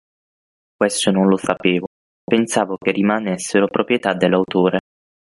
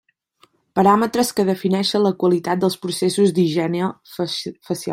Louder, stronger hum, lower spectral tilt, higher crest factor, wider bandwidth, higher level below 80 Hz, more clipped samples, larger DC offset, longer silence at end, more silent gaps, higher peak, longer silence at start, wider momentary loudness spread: about the same, -18 LUFS vs -19 LUFS; neither; about the same, -5 dB/octave vs -5.5 dB/octave; about the same, 16 dB vs 18 dB; second, 11.5 kHz vs 16 kHz; about the same, -58 dBFS vs -62 dBFS; neither; neither; first, 0.5 s vs 0 s; first, 1.87-2.27 s vs none; about the same, -2 dBFS vs -2 dBFS; about the same, 0.8 s vs 0.75 s; second, 5 LU vs 10 LU